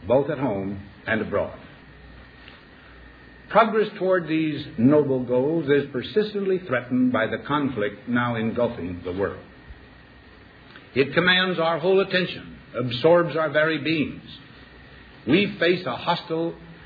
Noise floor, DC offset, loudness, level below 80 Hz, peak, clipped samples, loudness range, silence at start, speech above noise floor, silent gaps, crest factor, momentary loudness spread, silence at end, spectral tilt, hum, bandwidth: -48 dBFS; under 0.1%; -23 LUFS; -54 dBFS; -4 dBFS; under 0.1%; 6 LU; 0 s; 26 dB; none; 20 dB; 12 LU; 0 s; -8.5 dB/octave; none; 5 kHz